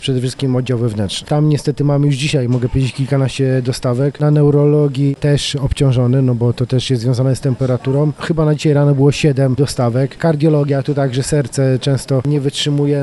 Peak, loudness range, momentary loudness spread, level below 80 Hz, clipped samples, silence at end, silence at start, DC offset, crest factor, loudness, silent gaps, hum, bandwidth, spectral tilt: 0 dBFS; 2 LU; 5 LU; -36 dBFS; under 0.1%; 0 s; 0 s; under 0.1%; 14 dB; -15 LUFS; none; none; 12 kHz; -6.5 dB/octave